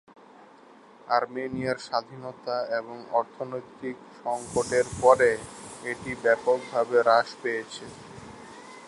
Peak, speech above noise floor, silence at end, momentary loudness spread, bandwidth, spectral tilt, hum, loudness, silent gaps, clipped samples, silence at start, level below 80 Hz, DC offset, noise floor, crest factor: -4 dBFS; 26 dB; 0 s; 20 LU; 11.5 kHz; -4 dB/octave; none; -26 LUFS; none; under 0.1%; 1.05 s; -60 dBFS; under 0.1%; -52 dBFS; 24 dB